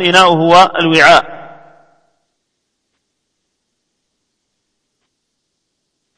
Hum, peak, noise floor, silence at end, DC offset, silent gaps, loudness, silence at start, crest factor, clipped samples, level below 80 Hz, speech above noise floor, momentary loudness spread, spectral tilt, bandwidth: none; 0 dBFS; -71 dBFS; 4.75 s; under 0.1%; none; -8 LUFS; 0 s; 14 dB; 0.5%; -50 dBFS; 63 dB; 17 LU; -4 dB/octave; 11 kHz